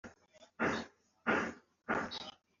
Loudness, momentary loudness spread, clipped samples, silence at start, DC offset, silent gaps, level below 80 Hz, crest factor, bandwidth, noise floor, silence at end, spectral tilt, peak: -38 LUFS; 17 LU; under 0.1%; 0.05 s; under 0.1%; none; -72 dBFS; 20 dB; 7.4 kHz; -64 dBFS; 0.3 s; -2.5 dB/octave; -20 dBFS